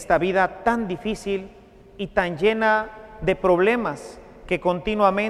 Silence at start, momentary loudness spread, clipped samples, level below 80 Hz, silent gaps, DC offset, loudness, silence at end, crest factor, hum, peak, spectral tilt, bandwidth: 0 s; 13 LU; under 0.1%; -46 dBFS; none; under 0.1%; -22 LUFS; 0 s; 18 dB; none; -4 dBFS; -6 dB/octave; 13 kHz